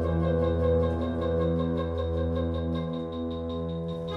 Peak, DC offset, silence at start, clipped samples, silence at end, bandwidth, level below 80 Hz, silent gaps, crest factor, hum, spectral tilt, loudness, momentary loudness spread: -14 dBFS; under 0.1%; 0 s; under 0.1%; 0 s; 5.4 kHz; -38 dBFS; none; 14 dB; none; -9.5 dB/octave; -29 LUFS; 7 LU